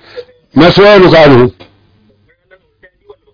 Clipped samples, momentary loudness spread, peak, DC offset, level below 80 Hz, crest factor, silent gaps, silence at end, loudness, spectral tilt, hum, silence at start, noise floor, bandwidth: 3%; 9 LU; 0 dBFS; under 0.1%; -34 dBFS; 8 dB; none; 1.85 s; -5 LUFS; -7.5 dB/octave; none; 0.15 s; -50 dBFS; 5.4 kHz